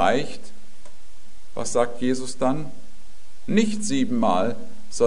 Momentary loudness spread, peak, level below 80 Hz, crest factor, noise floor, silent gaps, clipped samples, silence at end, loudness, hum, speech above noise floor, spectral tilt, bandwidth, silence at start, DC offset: 17 LU; -6 dBFS; -54 dBFS; 20 dB; -52 dBFS; none; under 0.1%; 0 s; -24 LUFS; none; 28 dB; -5 dB/octave; 11 kHz; 0 s; 7%